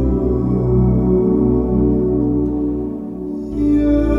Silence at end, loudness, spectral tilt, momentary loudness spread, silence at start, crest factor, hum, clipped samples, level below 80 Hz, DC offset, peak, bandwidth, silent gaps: 0 s; -17 LUFS; -11.5 dB/octave; 10 LU; 0 s; 12 dB; none; under 0.1%; -24 dBFS; under 0.1%; -4 dBFS; 5.6 kHz; none